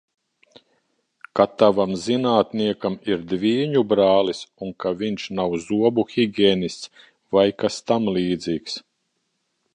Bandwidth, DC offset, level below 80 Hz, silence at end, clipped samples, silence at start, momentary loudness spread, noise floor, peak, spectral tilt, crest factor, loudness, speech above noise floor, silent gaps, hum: 10.5 kHz; under 0.1%; -58 dBFS; 0.95 s; under 0.1%; 1.35 s; 10 LU; -73 dBFS; -2 dBFS; -6 dB/octave; 20 dB; -21 LUFS; 53 dB; none; none